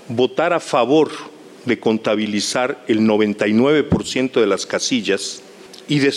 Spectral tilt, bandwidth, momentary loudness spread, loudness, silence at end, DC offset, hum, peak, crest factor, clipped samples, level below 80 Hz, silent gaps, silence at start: -4.5 dB/octave; 13 kHz; 10 LU; -18 LUFS; 0 s; under 0.1%; none; -4 dBFS; 14 dB; under 0.1%; -50 dBFS; none; 0.05 s